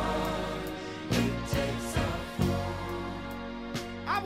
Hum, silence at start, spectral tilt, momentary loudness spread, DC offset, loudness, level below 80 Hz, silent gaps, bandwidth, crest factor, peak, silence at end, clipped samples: none; 0 s; -5.5 dB/octave; 8 LU; under 0.1%; -33 LUFS; -44 dBFS; none; 16 kHz; 16 dB; -14 dBFS; 0 s; under 0.1%